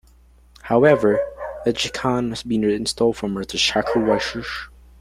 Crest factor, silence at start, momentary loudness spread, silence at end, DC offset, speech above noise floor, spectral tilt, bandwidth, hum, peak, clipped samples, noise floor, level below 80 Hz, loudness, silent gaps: 20 dB; 0.65 s; 13 LU; 0.3 s; under 0.1%; 31 dB; -4.5 dB/octave; 15.5 kHz; none; -2 dBFS; under 0.1%; -51 dBFS; -46 dBFS; -20 LUFS; none